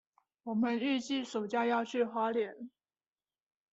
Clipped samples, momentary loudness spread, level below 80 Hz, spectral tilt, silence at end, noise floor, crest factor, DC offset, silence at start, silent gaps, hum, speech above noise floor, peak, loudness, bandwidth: under 0.1%; 13 LU; -82 dBFS; -5 dB/octave; 1.05 s; under -90 dBFS; 16 dB; under 0.1%; 0.45 s; none; none; over 57 dB; -20 dBFS; -34 LUFS; 8 kHz